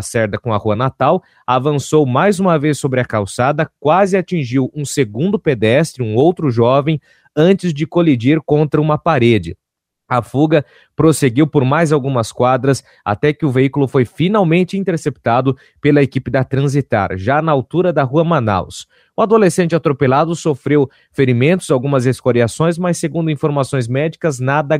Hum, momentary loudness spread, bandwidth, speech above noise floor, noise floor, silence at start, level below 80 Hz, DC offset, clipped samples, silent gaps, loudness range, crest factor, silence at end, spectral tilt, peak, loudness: none; 6 LU; 15.5 kHz; 47 dB; -62 dBFS; 0 s; -48 dBFS; under 0.1%; under 0.1%; none; 1 LU; 14 dB; 0 s; -6.5 dB/octave; 0 dBFS; -15 LUFS